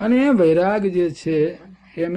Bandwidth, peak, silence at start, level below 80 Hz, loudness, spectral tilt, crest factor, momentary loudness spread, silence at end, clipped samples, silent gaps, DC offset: 9.6 kHz; -8 dBFS; 0 s; -54 dBFS; -18 LUFS; -7.5 dB/octave; 10 dB; 10 LU; 0 s; under 0.1%; none; under 0.1%